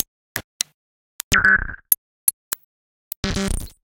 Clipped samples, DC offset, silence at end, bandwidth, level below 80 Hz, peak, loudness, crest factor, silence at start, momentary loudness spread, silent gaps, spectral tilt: under 0.1%; under 0.1%; 0.15 s; 17 kHz; -36 dBFS; 0 dBFS; -21 LUFS; 24 dB; 0.35 s; 16 LU; 0.44-0.60 s, 0.74-1.31 s, 1.98-2.27 s, 2.33-2.51 s, 2.64-3.23 s; -2 dB/octave